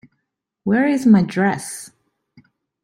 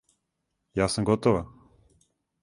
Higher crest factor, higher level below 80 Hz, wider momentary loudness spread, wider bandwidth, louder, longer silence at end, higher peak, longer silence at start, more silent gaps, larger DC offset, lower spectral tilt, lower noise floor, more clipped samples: about the same, 18 dB vs 22 dB; second, -60 dBFS vs -50 dBFS; first, 16 LU vs 11 LU; first, 14 kHz vs 11.5 kHz; first, -17 LUFS vs -26 LUFS; about the same, 0.95 s vs 0.95 s; first, -2 dBFS vs -8 dBFS; about the same, 0.65 s vs 0.75 s; neither; neither; about the same, -6.5 dB/octave vs -5.5 dB/octave; about the same, -77 dBFS vs -80 dBFS; neither